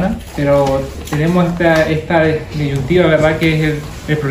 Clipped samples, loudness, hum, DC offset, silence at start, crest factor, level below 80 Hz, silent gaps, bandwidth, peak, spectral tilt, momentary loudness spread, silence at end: under 0.1%; -14 LUFS; none; under 0.1%; 0 s; 14 dB; -32 dBFS; none; 16 kHz; 0 dBFS; -7 dB/octave; 8 LU; 0 s